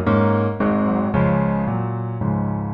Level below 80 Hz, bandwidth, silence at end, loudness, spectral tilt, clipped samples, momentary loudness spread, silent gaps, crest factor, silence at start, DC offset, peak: -40 dBFS; 4.7 kHz; 0 s; -20 LUFS; -11.5 dB/octave; under 0.1%; 6 LU; none; 14 dB; 0 s; under 0.1%; -4 dBFS